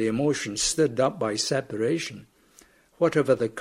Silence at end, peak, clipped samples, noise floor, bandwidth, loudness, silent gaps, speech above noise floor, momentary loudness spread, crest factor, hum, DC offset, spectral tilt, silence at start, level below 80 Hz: 0 s; -8 dBFS; under 0.1%; -57 dBFS; 15.5 kHz; -25 LUFS; none; 32 dB; 4 LU; 18 dB; none; under 0.1%; -4 dB/octave; 0 s; -56 dBFS